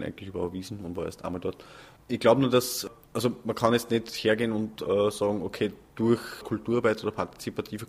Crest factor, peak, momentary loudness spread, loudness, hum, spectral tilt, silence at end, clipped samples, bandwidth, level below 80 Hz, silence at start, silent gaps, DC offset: 22 dB; -6 dBFS; 11 LU; -28 LUFS; none; -5 dB/octave; 0.05 s; under 0.1%; 15.5 kHz; -58 dBFS; 0 s; none; under 0.1%